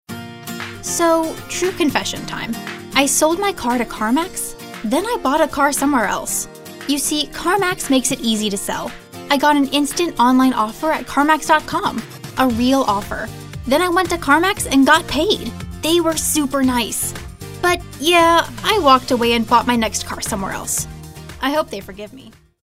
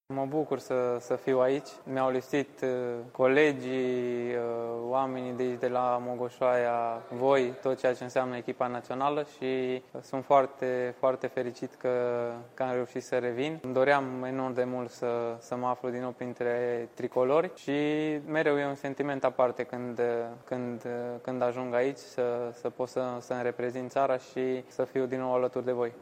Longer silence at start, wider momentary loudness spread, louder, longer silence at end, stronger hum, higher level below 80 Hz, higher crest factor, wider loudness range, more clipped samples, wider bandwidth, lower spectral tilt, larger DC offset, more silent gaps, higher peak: about the same, 0.1 s vs 0.1 s; first, 14 LU vs 9 LU; first, -17 LUFS vs -31 LUFS; first, 0.35 s vs 0 s; neither; first, -40 dBFS vs -76 dBFS; about the same, 18 dB vs 20 dB; about the same, 3 LU vs 3 LU; neither; first, 16 kHz vs 14.5 kHz; second, -3 dB/octave vs -6 dB/octave; neither; neither; first, 0 dBFS vs -10 dBFS